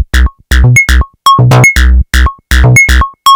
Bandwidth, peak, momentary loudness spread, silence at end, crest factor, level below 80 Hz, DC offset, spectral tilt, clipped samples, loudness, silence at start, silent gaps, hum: 18.5 kHz; 0 dBFS; 7 LU; 0 s; 6 dB; -10 dBFS; under 0.1%; -4 dB/octave; 5%; -6 LUFS; 0 s; none; none